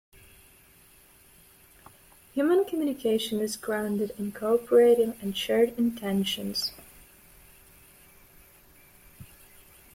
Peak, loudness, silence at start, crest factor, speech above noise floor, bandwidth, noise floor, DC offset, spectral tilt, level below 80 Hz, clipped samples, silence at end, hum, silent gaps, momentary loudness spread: -10 dBFS; -26 LUFS; 2.35 s; 18 dB; 31 dB; 16.5 kHz; -57 dBFS; under 0.1%; -5 dB/octave; -62 dBFS; under 0.1%; 0.7 s; none; none; 11 LU